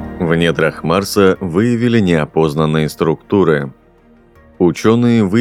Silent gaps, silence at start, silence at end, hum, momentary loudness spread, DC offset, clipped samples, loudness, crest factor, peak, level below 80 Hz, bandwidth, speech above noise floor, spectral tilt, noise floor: none; 0 s; 0 s; none; 4 LU; under 0.1%; under 0.1%; -14 LUFS; 14 dB; 0 dBFS; -42 dBFS; 16 kHz; 34 dB; -6.5 dB/octave; -47 dBFS